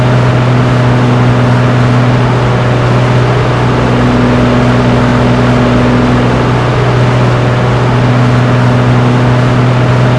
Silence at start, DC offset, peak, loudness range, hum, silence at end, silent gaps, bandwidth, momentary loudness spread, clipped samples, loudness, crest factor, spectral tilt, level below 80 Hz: 0 s; under 0.1%; 0 dBFS; 0 LU; none; 0 s; none; 10 kHz; 1 LU; 2%; -8 LUFS; 8 dB; -7.5 dB/octave; -24 dBFS